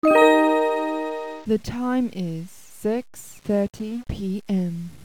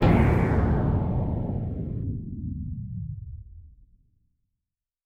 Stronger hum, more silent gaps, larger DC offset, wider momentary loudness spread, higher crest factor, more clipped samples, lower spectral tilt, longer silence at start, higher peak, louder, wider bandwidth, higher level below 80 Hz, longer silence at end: neither; neither; neither; about the same, 15 LU vs 15 LU; about the same, 20 dB vs 18 dB; neither; second, -6.5 dB/octave vs -9.5 dB/octave; about the same, 0.05 s vs 0 s; first, -2 dBFS vs -8 dBFS; first, -23 LUFS vs -27 LUFS; first, 19.5 kHz vs 5.6 kHz; second, -48 dBFS vs -34 dBFS; second, 0.05 s vs 1.35 s